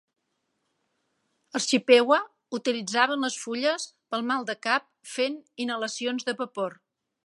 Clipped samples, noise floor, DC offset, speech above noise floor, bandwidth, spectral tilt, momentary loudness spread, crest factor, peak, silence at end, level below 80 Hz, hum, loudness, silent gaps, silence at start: under 0.1%; -78 dBFS; under 0.1%; 52 dB; 11.5 kHz; -2.5 dB/octave; 14 LU; 24 dB; -4 dBFS; 0.55 s; -84 dBFS; none; -26 LUFS; none; 1.55 s